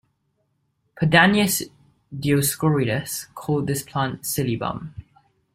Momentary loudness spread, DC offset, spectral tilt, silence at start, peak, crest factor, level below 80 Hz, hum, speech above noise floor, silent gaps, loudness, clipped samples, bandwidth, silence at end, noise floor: 15 LU; under 0.1%; -4.5 dB/octave; 0.95 s; -2 dBFS; 22 dB; -54 dBFS; none; 49 dB; none; -21 LUFS; under 0.1%; 16 kHz; 0.55 s; -71 dBFS